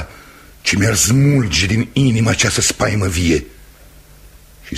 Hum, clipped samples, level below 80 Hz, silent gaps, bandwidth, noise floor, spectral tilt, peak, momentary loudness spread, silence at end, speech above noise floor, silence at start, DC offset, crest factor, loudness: none; under 0.1%; -34 dBFS; none; 15.5 kHz; -43 dBFS; -4 dB/octave; -2 dBFS; 6 LU; 0 s; 28 dB; 0 s; under 0.1%; 16 dB; -15 LUFS